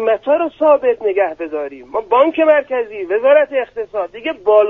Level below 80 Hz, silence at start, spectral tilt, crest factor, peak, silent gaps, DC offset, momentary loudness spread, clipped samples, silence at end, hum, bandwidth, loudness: -58 dBFS; 0 s; -6 dB/octave; 14 dB; 0 dBFS; none; under 0.1%; 11 LU; under 0.1%; 0 s; none; 3.9 kHz; -16 LUFS